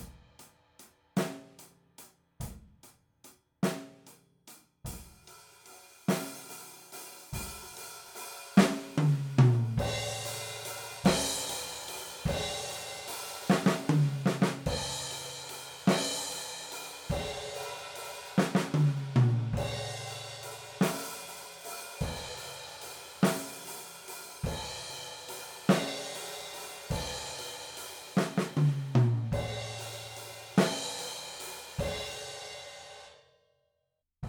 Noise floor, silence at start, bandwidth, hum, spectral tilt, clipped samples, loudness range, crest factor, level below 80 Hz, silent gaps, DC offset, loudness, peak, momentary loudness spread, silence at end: -82 dBFS; 0 s; over 20 kHz; none; -5 dB/octave; under 0.1%; 11 LU; 26 dB; -52 dBFS; none; under 0.1%; -33 LUFS; -8 dBFS; 16 LU; 0 s